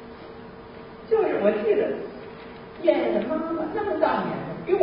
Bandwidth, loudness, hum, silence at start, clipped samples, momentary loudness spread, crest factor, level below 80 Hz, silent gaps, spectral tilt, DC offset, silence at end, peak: 5.4 kHz; -25 LUFS; none; 0 s; under 0.1%; 20 LU; 20 dB; -58 dBFS; none; -10.5 dB/octave; under 0.1%; 0 s; -6 dBFS